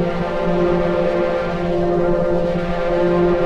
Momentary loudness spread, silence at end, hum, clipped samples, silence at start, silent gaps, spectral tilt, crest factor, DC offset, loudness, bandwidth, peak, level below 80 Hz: 4 LU; 0 s; none; under 0.1%; 0 s; none; -8 dB/octave; 12 dB; under 0.1%; -18 LUFS; 7.6 kHz; -6 dBFS; -30 dBFS